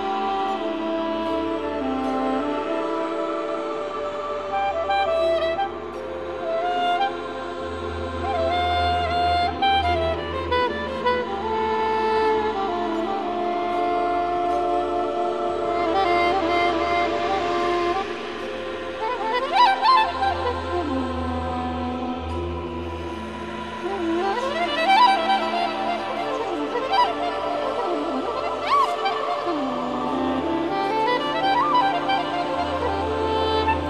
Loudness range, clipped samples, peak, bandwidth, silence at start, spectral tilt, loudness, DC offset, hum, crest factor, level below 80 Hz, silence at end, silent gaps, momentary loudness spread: 4 LU; under 0.1%; -6 dBFS; 12 kHz; 0 s; -5.5 dB/octave; -23 LUFS; 0.3%; none; 18 dB; -44 dBFS; 0 s; none; 9 LU